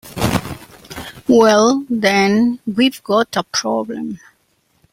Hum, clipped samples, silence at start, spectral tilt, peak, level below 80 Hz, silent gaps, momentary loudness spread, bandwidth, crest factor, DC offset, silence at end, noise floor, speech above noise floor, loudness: none; under 0.1%; 0.05 s; -4.5 dB/octave; -2 dBFS; -46 dBFS; none; 20 LU; 16.5 kHz; 16 dB; under 0.1%; 0.75 s; -61 dBFS; 46 dB; -16 LUFS